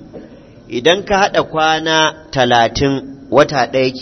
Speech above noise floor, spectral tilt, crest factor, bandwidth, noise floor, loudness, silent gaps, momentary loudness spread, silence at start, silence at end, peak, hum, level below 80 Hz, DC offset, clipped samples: 24 dB; -4 dB/octave; 14 dB; 7.4 kHz; -38 dBFS; -14 LUFS; none; 5 LU; 0 s; 0 s; 0 dBFS; none; -40 dBFS; under 0.1%; under 0.1%